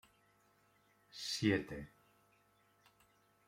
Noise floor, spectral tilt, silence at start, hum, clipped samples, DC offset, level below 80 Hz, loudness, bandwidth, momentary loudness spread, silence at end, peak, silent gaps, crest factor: -73 dBFS; -4.5 dB/octave; 1.15 s; 50 Hz at -65 dBFS; under 0.1%; under 0.1%; -70 dBFS; -38 LUFS; 16.5 kHz; 21 LU; 1.6 s; -18 dBFS; none; 26 dB